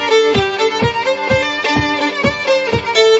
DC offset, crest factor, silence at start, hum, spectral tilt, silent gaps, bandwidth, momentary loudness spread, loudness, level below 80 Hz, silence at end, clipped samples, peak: under 0.1%; 14 dB; 0 s; none; -4 dB/octave; none; 8 kHz; 4 LU; -14 LUFS; -40 dBFS; 0 s; under 0.1%; 0 dBFS